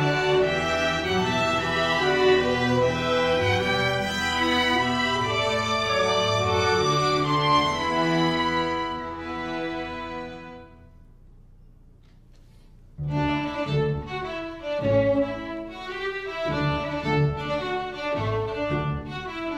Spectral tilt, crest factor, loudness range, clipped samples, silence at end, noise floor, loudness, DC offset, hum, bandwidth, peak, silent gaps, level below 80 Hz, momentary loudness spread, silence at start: -5 dB/octave; 16 dB; 12 LU; under 0.1%; 0 s; -51 dBFS; -24 LUFS; under 0.1%; none; 16 kHz; -8 dBFS; none; -46 dBFS; 11 LU; 0 s